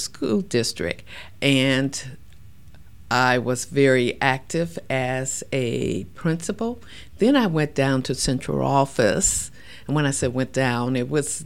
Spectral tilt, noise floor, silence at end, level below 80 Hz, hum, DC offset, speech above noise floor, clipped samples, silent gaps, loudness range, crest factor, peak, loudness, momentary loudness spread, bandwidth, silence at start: -4.5 dB/octave; -48 dBFS; 0 s; -46 dBFS; none; 0.8%; 25 dB; under 0.1%; none; 3 LU; 20 dB; -4 dBFS; -22 LUFS; 10 LU; 16.5 kHz; 0 s